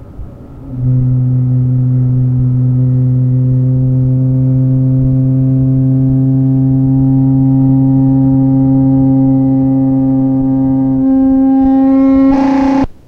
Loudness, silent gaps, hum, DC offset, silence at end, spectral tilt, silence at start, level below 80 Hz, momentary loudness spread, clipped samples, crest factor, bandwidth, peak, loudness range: -10 LUFS; none; none; under 0.1%; 0.15 s; -11.5 dB/octave; 0 s; -30 dBFS; 3 LU; under 0.1%; 8 dB; 2.9 kHz; -2 dBFS; 2 LU